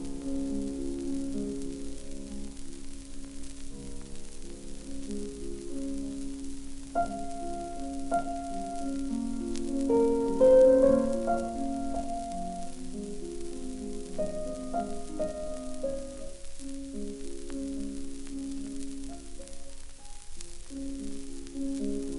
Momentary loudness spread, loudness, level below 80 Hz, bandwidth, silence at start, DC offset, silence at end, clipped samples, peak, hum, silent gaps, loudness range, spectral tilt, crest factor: 18 LU; -32 LUFS; -42 dBFS; 11.5 kHz; 0 s; under 0.1%; 0 s; under 0.1%; -12 dBFS; none; none; 16 LU; -6 dB/octave; 20 dB